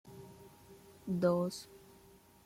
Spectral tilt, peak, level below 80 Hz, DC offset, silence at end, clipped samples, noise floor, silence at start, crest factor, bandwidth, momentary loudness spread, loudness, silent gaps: -7 dB/octave; -20 dBFS; -72 dBFS; under 0.1%; 0.7 s; under 0.1%; -62 dBFS; 0.05 s; 20 dB; 16.5 kHz; 26 LU; -35 LUFS; none